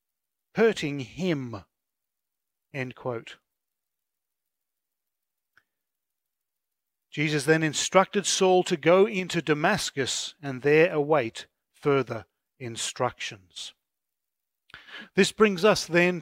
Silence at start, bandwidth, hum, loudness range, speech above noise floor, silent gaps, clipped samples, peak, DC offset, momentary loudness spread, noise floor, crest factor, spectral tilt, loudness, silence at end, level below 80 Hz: 0.55 s; 16 kHz; none; 17 LU; 62 dB; none; under 0.1%; -2 dBFS; under 0.1%; 18 LU; -87 dBFS; 24 dB; -4 dB/octave; -25 LUFS; 0 s; -66 dBFS